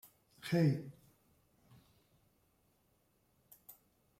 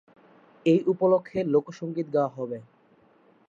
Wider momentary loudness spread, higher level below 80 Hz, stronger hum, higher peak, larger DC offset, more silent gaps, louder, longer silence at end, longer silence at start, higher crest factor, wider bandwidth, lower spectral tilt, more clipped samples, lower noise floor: first, 26 LU vs 12 LU; about the same, -76 dBFS vs -72 dBFS; neither; second, -22 dBFS vs -10 dBFS; neither; neither; second, -35 LUFS vs -26 LUFS; second, 0.5 s vs 0.85 s; second, 0.45 s vs 0.65 s; about the same, 20 dB vs 16 dB; first, 16 kHz vs 7.6 kHz; about the same, -7.5 dB/octave vs -8.5 dB/octave; neither; first, -76 dBFS vs -60 dBFS